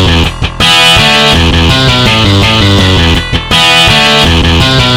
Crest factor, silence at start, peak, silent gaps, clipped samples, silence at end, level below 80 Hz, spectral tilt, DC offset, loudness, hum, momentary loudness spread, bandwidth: 6 dB; 0 s; 0 dBFS; none; 2%; 0 s; -16 dBFS; -4 dB/octave; under 0.1%; -5 LUFS; none; 6 LU; 17 kHz